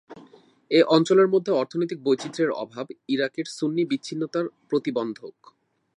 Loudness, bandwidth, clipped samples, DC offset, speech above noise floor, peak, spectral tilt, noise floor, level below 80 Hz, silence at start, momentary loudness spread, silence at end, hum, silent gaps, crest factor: -24 LUFS; 10.5 kHz; under 0.1%; under 0.1%; 30 dB; -4 dBFS; -5.5 dB/octave; -53 dBFS; -80 dBFS; 0.1 s; 14 LU; 0.65 s; none; none; 20 dB